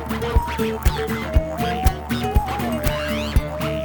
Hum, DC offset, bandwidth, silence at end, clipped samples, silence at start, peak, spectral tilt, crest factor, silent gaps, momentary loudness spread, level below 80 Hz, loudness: none; under 0.1%; over 20 kHz; 0 s; under 0.1%; 0 s; -2 dBFS; -6 dB/octave; 18 dB; none; 3 LU; -24 dBFS; -22 LUFS